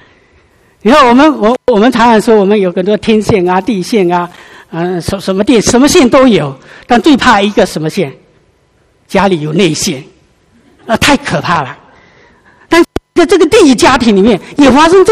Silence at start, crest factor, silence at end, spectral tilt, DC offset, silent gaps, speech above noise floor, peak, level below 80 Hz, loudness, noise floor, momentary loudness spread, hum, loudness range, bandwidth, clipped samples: 0.85 s; 8 dB; 0 s; -4.5 dB/octave; under 0.1%; none; 43 dB; 0 dBFS; -34 dBFS; -8 LUFS; -51 dBFS; 10 LU; none; 6 LU; 15 kHz; 2%